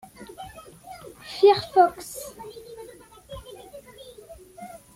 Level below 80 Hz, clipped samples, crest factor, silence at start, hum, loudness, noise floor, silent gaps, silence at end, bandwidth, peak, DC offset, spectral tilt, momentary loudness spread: -58 dBFS; under 0.1%; 22 dB; 0.2 s; none; -21 LUFS; -47 dBFS; none; 0.3 s; 16 kHz; -6 dBFS; under 0.1%; -4 dB/octave; 26 LU